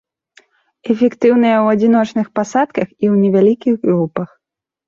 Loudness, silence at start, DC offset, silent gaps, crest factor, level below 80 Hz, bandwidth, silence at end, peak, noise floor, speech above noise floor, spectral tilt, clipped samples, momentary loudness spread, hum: -14 LUFS; 0.85 s; under 0.1%; none; 14 dB; -60 dBFS; 7.4 kHz; 0.6 s; -2 dBFS; -52 dBFS; 39 dB; -7.5 dB/octave; under 0.1%; 9 LU; none